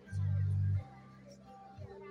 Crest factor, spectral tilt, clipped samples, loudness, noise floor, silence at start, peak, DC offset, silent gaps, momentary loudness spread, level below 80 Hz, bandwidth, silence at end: 10 dB; -9 dB/octave; under 0.1%; -35 LUFS; -55 dBFS; 0 s; -26 dBFS; under 0.1%; none; 22 LU; -64 dBFS; 6.2 kHz; 0 s